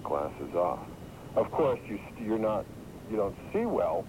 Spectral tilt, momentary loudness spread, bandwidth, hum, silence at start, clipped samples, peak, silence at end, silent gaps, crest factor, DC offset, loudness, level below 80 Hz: -7.5 dB/octave; 13 LU; 16 kHz; none; 0 s; under 0.1%; -16 dBFS; 0 s; none; 14 dB; under 0.1%; -32 LUFS; -54 dBFS